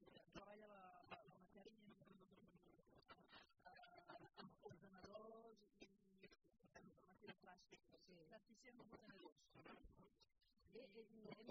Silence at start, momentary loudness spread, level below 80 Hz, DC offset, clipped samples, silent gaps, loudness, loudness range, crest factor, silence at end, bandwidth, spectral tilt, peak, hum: 0 s; 6 LU; -84 dBFS; under 0.1%; under 0.1%; 9.32-9.36 s; -66 LUFS; 3 LU; 22 dB; 0 s; 6.2 kHz; -3.5 dB/octave; -44 dBFS; none